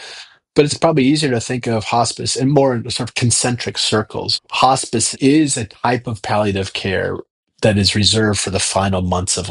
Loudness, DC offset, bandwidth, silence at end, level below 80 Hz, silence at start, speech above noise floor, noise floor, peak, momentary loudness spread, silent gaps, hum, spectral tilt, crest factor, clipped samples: -16 LUFS; under 0.1%; 11.5 kHz; 0 s; -46 dBFS; 0 s; 21 dB; -38 dBFS; 0 dBFS; 7 LU; 7.30-7.43 s; none; -4 dB/octave; 16 dB; under 0.1%